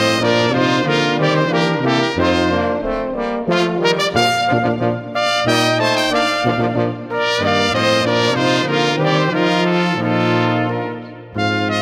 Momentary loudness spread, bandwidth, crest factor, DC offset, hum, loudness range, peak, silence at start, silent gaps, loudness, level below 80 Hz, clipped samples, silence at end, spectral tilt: 6 LU; 15.5 kHz; 16 dB; under 0.1%; none; 1 LU; 0 dBFS; 0 s; none; -16 LUFS; -46 dBFS; under 0.1%; 0 s; -5 dB/octave